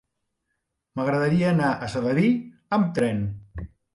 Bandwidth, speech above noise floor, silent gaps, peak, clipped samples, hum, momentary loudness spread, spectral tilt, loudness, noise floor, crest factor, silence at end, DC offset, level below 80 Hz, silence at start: 11.5 kHz; 56 dB; none; -10 dBFS; under 0.1%; none; 16 LU; -7.5 dB/octave; -24 LUFS; -79 dBFS; 14 dB; 0.3 s; under 0.1%; -50 dBFS; 0.95 s